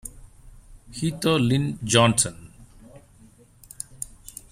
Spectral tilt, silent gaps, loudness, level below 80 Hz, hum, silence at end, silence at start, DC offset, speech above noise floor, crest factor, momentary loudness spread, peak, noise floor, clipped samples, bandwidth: -4 dB/octave; none; -22 LUFS; -50 dBFS; none; 0.45 s; 0.05 s; under 0.1%; 31 dB; 24 dB; 22 LU; -2 dBFS; -53 dBFS; under 0.1%; 16 kHz